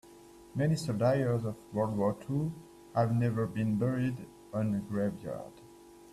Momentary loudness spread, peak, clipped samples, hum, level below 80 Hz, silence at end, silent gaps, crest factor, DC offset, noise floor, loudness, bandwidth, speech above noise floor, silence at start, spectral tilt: 13 LU; -16 dBFS; under 0.1%; none; -62 dBFS; 0 s; none; 18 dB; under 0.1%; -54 dBFS; -32 LUFS; 13.5 kHz; 23 dB; 0.05 s; -8 dB/octave